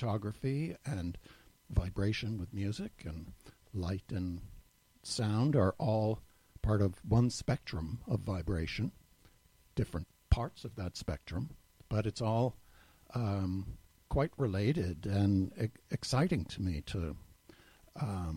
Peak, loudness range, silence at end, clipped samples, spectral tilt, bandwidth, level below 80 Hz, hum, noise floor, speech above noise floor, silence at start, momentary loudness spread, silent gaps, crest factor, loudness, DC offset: -14 dBFS; 6 LU; 0 s; under 0.1%; -7 dB/octave; 16 kHz; -48 dBFS; none; -65 dBFS; 31 dB; 0 s; 13 LU; none; 22 dB; -36 LUFS; under 0.1%